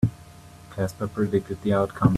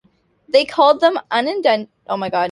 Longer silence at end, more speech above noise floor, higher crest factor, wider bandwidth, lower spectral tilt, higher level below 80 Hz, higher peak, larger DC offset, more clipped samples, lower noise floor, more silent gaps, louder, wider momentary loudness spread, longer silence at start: about the same, 0 s vs 0 s; second, 23 dB vs 34 dB; first, 22 dB vs 16 dB; first, 13.5 kHz vs 11.5 kHz; first, -8.5 dB/octave vs -4.5 dB/octave; first, -48 dBFS vs -66 dBFS; about the same, -4 dBFS vs -2 dBFS; neither; neither; second, -46 dBFS vs -51 dBFS; neither; second, -26 LUFS vs -17 LUFS; first, 12 LU vs 9 LU; second, 0 s vs 0.55 s